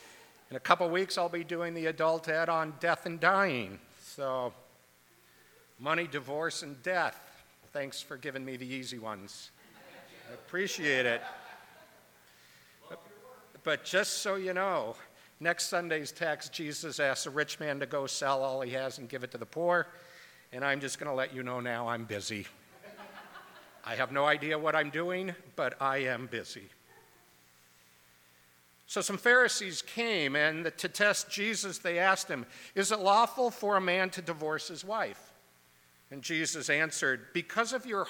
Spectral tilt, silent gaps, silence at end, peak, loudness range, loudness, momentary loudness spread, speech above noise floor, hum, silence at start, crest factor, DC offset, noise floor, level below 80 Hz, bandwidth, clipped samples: -3 dB/octave; none; 0 s; -6 dBFS; 8 LU; -32 LUFS; 19 LU; 32 dB; none; 0 s; 26 dB; under 0.1%; -64 dBFS; -82 dBFS; 19 kHz; under 0.1%